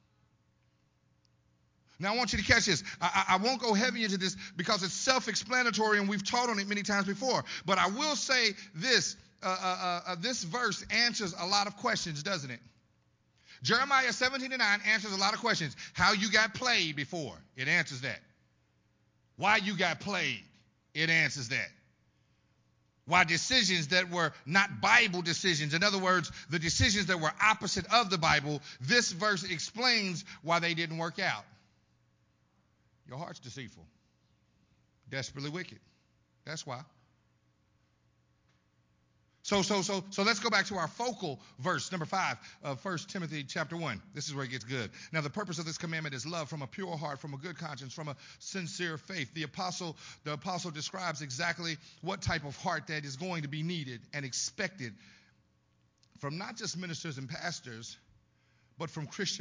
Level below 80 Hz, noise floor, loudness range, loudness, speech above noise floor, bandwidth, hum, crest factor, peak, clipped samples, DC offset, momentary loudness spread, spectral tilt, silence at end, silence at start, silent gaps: -60 dBFS; -72 dBFS; 13 LU; -31 LUFS; 40 dB; 7.8 kHz; none; 24 dB; -10 dBFS; under 0.1%; under 0.1%; 14 LU; -3 dB/octave; 0 s; 2 s; none